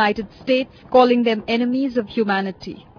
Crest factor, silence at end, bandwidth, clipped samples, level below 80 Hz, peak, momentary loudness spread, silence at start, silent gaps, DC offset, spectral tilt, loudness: 18 dB; 0.2 s; 5.4 kHz; under 0.1%; -54 dBFS; -2 dBFS; 10 LU; 0 s; none; under 0.1%; -6.5 dB/octave; -19 LUFS